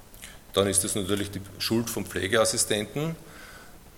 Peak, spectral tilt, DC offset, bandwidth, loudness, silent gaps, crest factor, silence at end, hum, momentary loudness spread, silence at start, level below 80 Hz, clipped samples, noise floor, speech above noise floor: -6 dBFS; -3 dB/octave; under 0.1%; 17.5 kHz; -26 LUFS; none; 22 dB; 0 s; none; 22 LU; 0 s; -54 dBFS; under 0.1%; -47 dBFS; 20 dB